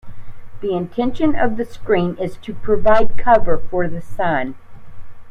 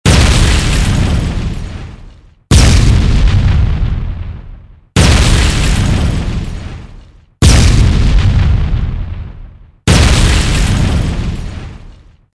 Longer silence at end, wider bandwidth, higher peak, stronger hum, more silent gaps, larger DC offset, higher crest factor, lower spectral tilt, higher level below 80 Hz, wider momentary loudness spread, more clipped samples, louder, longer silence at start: second, 0 s vs 0.45 s; second, 5.2 kHz vs 11 kHz; about the same, 0 dBFS vs 0 dBFS; neither; neither; neither; about the same, 14 dB vs 10 dB; first, -8 dB/octave vs -5 dB/octave; second, -32 dBFS vs -14 dBFS; second, 11 LU vs 18 LU; second, under 0.1% vs 0.4%; second, -19 LUFS vs -12 LUFS; about the same, 0.05 s vs 0.05 s